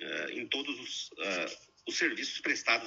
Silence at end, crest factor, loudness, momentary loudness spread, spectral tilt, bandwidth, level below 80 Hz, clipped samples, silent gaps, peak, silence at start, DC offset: 0 s; 22 dB; -33 LUFS; 8 LU; -1 dB/octave; 8 kHz; -80 dBFS; under 0.1%; none; -14 dBFS; 0 s; under 0.1%